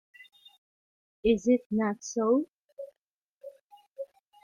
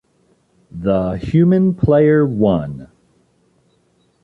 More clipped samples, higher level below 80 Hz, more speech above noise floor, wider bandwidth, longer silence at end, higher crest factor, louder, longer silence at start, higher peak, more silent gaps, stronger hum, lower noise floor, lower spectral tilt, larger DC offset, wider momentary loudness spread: neither; second, -58 dBFS vs -40 dBFS; first, 58 dB vs 45 dB; first, 9.6 kHz vs 4.6 kHz; second, 0.4 s vs 1.4 s; about the same, 18 dB vs 14 dB; second, -28 LUFS vs -15 LUFS; first, 1.25 s vs 0.75 s; second, -12 dBFS vs -2 dBFS; first, 1.66-1.70 s, 2.52-2.68 s, 2.98-3.41 s, 3.61-3.70 s, 3.90-3.96 s vs none; neither; first, -84 dBFS vs -59 dBFS; second, -5.5 dB/octave vs -10.5 dB/octave; neither; first, 24 LU vs 16 LU